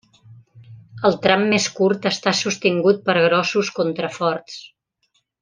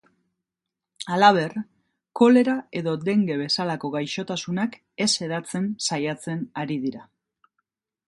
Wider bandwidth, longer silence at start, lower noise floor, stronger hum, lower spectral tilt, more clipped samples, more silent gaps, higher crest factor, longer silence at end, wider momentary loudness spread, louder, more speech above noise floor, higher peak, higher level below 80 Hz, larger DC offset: second, 10 kHz vs 11.5 kHz; second, 0.3 s vs 1 s; second, -68 dBFS vs -86 dBFS; neither; about the same, -4 dB/octave vs -4.5 dB/octave; neither; neither; about the same, 18 dB vs 22 dB; second, 0.75 s vs 1.05 s; second, 7 LU vs 13 LU; first, -19 LUFS vs -23 LUFS; second, 49 dB vs 63 dB; about the same, -2 dBFS vs -2 dBFS; first, -64 dBFS vs -70 dBFS; neither